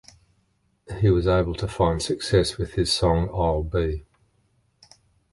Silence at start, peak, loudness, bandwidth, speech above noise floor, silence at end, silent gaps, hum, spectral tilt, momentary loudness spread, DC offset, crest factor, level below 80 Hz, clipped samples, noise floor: 0.9 s; -6 dBFS; -23 LUFS; 11.5 kHz; 45 dB; 1.3 s; none; none; -6 dB/octave; 7 LU; under 0.1%; 18 dB; -36 dBFS; under 0.1%; -68 dBFS